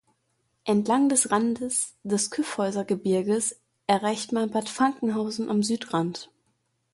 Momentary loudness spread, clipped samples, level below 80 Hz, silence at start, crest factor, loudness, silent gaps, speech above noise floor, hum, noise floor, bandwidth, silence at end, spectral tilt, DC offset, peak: 7 LU; under 0.1%; -68 dBFS; 0.65 s; 20 dB; -26 LUFS; none; 48 dB; none; -73 dBFS; 11.5 kHz; 0.7 s; -4 dB/octave; under 0.1%; -6 dBFS